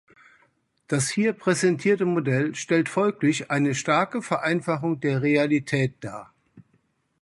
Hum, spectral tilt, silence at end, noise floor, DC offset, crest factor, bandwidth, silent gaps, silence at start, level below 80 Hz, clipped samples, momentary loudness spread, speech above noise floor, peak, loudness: none; -5.5 dB/octave; 0.6 s; -68 dBFS; under 0.1%; 18 dB; 11.5 kHz; none; 0.9 s; -66 dBFS; under 0.1%; 5 LU; 44 dB; -6 dBFS; -24 LUFS